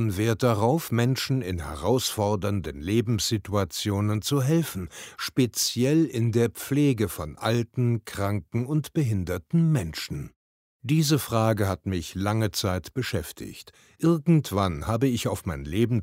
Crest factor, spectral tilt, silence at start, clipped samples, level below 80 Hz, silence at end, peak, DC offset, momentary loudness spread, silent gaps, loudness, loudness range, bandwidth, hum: 18 dB; -5.5 dB/octave; 0 s; under 0.1%; -48 dBFS; 0 s; -8 dBFS; under 0.1%; 9 LU; 10.36-10.80 s; -26 LUFS; 2 LU; 16 kHz; none